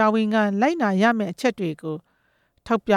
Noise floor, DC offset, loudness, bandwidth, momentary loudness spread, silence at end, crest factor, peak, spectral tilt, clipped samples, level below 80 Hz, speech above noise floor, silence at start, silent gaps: -66 dBFS; under 0.1%; -22 LUFS; 13.5 kHz; 12 LU; 0 s; 16 dB; -6 dBFS; -6.5 dB/octave; under 0.1%; -60 dBFS; 45 dB; 0 s; none